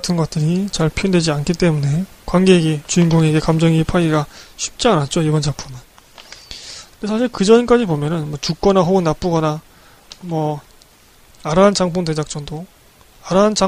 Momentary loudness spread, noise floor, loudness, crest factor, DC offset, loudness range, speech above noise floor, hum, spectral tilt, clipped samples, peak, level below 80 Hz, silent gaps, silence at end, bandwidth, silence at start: 17 LU; -48 dBFS; -16 LUFS; 16 dB; under 0.1%; 5 LU; 32 dB; none; -6 dB/octave; under 0.1%; 0 dBFS; -38 dBFS; none; 0 s; 14.5 kHz; 0 s